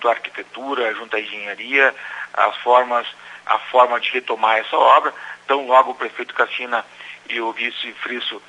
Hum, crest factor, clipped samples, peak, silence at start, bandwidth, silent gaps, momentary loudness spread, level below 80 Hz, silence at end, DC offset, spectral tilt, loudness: 60 Hz at -65 dBFS; 20 dB; under 0.1%; 0 dBFS; 0 s; 10.5 kHz; none; 12 LU; -80 dBFS; 0.1 s; under 0.1%; -2.5 dB/octave; -19 LUFS